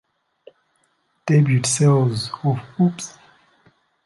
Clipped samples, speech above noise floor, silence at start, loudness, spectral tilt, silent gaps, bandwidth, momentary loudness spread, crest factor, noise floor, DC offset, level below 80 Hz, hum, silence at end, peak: under 0.1%; 48 dB; 1.25 s; -19 LUFS; -5.5 dB/octave; none; 11.5 kHz; 16 LU; 16 dB; -66 dBFS; under 0.1%; -60 dBFS; none; 0.95 s; -6 dBFS